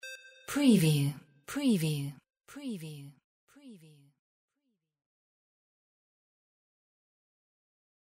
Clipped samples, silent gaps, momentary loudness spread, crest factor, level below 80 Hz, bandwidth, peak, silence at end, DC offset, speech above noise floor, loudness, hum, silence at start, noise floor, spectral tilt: under 0.1%; 3.24-3.47 s; 22 LU; 22 dB; -72 dBFS; 16 kHz; -12 dBFS; 4.25 s; under 0.1%; 54 dB; -30 LUFS; none; 0.05 s; -83 dBFS; -6 dB/octave